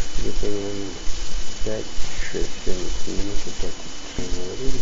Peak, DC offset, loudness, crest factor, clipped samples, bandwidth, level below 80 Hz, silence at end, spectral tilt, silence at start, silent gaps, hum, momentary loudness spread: -4 dBFS; under 0.1%; -30 LUFS; 12 dB; under 0.1%; 7.8 kHz; -28 dBFS; 0 s; -4 dB/octave; 0 s; none; none; 5 LU